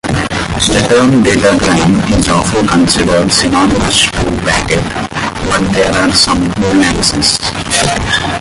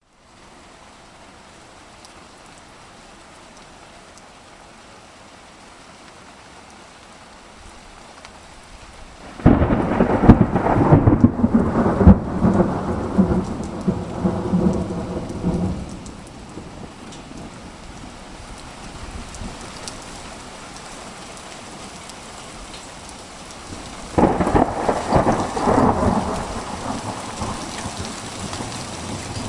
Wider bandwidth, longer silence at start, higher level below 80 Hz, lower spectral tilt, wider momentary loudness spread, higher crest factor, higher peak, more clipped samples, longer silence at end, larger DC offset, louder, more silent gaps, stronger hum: about the same, 11.5 kHz vs 11.5 kHz; second, 0.05 s vs 1.2 s; first, -26 dBFS vs -34 dBFS; second, -4 dB/octave vs -7 dB/octave; second, 6 LU vs 27 LU; second, 10 dB vs 22 dB; about the same, 0 dBFS vs 0 dBFS; neither; about the same, 0 s vs 0 s; neither; first, -10 LUFS vs -19 LUFS; neither; neither